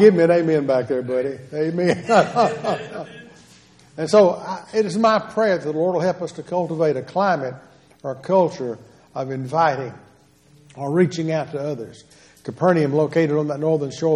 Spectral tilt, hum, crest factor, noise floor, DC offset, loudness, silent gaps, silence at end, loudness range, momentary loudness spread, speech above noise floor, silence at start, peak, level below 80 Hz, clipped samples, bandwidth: -6.5 dB/octave; none; 20 dB; -53 dBFS; under 0.1%; -20 LUFS; none; 0 s; 4 LU; 15 LU; 34 dB; 0 s; -2 dBFS; -64 dBFS; under 0.1%; 11 kHz